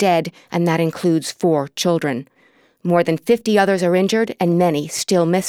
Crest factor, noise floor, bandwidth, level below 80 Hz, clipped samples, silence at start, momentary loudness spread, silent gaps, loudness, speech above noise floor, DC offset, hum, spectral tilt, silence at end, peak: 16 dB; -56 dBFS; 16.5 kHz; -66 dBFS; under 0.1%; 0 s; 5 LU; none; -18 LUFS; 38 dB; under 0.1%; none; -5.5 dB/octave; 0 s; -2 dBFS